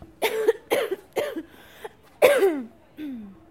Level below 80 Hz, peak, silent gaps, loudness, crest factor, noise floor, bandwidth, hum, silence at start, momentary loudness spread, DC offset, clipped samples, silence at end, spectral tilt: -64 dBFS; -2 dBFS; none; -24 LUFS; 24 dB; -44 dBFS; 16.5 kHz; none; 0 s; 23 LU; under 0.1%; under 0.1%; 0.2 s; -3 dB/octave